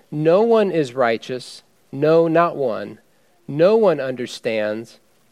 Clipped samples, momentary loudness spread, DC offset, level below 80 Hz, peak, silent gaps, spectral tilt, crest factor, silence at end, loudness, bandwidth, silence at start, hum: under 0.1%; 16 LU; under 0.1%; -72 dBFS; -2 dBFS; none; -6.5 dB/octave; 18 dB; 0.45 s; -18 LUFS; 12 kHz; 0.1 s; none